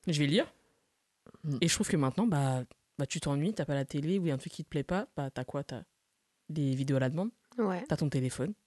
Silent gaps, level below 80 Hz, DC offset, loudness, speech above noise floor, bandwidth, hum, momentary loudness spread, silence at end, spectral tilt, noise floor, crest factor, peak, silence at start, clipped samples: none; -62 dBFS; under 0.1%; -33 LUFS; 47 dB; 12.5 kHz; none; 10 LU; 0.15 s; -5.5 dB/octave; -79 dBFS; 20 dB; -12 dBFS; 0.05 s; under 0.1%